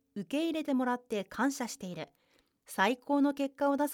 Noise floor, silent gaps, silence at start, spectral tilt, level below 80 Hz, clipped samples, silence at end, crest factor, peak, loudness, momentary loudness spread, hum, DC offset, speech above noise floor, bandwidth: -71 dBFS; none; 0.15 s; -4.5 dB/octave; -76 dBFS; under 0.1%; 0 s; 20 dB; -14 dBFS; -33 LUFS; 12 LU; none; under 0.1%; 39 dB; 17.5 kHz